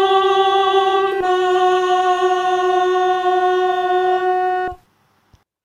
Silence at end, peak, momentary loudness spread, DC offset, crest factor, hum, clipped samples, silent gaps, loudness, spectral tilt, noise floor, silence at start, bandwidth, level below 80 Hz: 0.9 s; -4 dBFS; 3 LU; under 0.1%; 12 dB; none; under 0.1%; none; -16 LUFS; -3.5 dB/octave; -59 dBFS; 0 s; 10 kHz; -56 dBFS